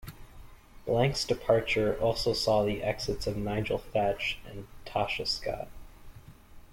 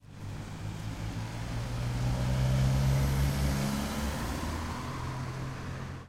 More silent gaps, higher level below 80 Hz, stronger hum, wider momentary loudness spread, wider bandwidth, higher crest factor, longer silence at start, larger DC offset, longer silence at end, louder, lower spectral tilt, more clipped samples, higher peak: neither; second, -48 dBFS vs -38 dBFS; neither; about the same, 14 LU vs 12 LU; about the same, 16.5 kHz vs 16 kHz; first, 20 dB vs 14 dB; about the same, 0 s vs 0.05 s; neither; about the same, 0.1 s vs 0 s; first, -30 LUFS vs -33 LUFS; about the same, -5 dB/octave vs -6 dB/octave; neither; first, -12 dBFS vs -18 dBFS